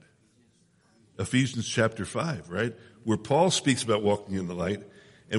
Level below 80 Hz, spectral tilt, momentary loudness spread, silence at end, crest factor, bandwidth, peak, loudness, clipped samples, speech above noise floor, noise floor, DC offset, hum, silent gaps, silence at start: -62 dBFS; -4.5 dB/octave; 10 LU; 0 s; 20 dB; 11.5 kHz; -10 dBFS; -28 LUFS; under 0.1%; 37 dB; -64 dBFS; under 0.1%; none; none; 1.2 s